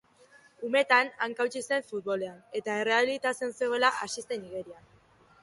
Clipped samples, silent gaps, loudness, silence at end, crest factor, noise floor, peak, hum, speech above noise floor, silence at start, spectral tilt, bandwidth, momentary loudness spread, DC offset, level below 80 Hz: under 0.1%; none; -29 LUFS; 0.7 s; 20 dB; -59 dBFS; -10 dBFS; none; 30 dB; 0.6 s; -2.5 dB/octave; 11.5 kHz; 12 LU; under 0.1%; -74 dBFS